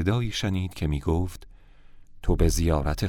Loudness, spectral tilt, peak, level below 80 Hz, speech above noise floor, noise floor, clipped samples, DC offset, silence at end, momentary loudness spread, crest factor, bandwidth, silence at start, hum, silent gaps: -27 LUFS; -6 dB/octave; -6 dBFS; -32 dBFS; 23 dB; -48 dBFS; under 0.1%; under 0.1%; 0 s; 11 LU; 18 dB; 17 kHz; 0 s; none; none